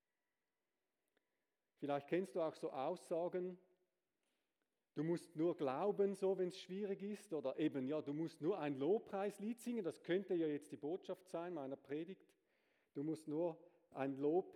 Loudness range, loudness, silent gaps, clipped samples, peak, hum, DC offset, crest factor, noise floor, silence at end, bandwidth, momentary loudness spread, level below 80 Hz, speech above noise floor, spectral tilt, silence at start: 5 LU; -43 LUFS; none; under 0.1%; -28 dBFS; none; under 0.1%; 16 dB; under -90 dBFS; 0.05 s; 14 kHz; 9 LU; under -90 dBFS; over 47 dB; -7 dB/octave; 1.8 s